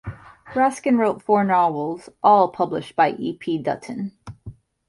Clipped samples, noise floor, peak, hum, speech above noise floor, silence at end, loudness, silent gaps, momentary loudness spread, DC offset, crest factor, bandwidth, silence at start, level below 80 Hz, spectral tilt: under 0.1%; -42 dBFS; -4 dBFS; none; 22 dB; 0.35 s; -21 LUFS; none; 15 LU; under 0.1%; 18 dB; 11.5 kHz; 0.05 s; -54 dBFS; -6.5 dB/octave